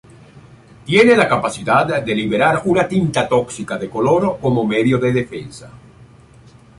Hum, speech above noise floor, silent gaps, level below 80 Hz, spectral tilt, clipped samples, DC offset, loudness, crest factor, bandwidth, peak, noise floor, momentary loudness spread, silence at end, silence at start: none; 29 dB; none; -48 dBFS; -6 dB/octave; under 0.1%; under 0.1%; -16 LUFS; 16 dB; 11.5 kHz; -2 dBFS; -45 dBFS; 13 LU; 1.05 s; 0.35 s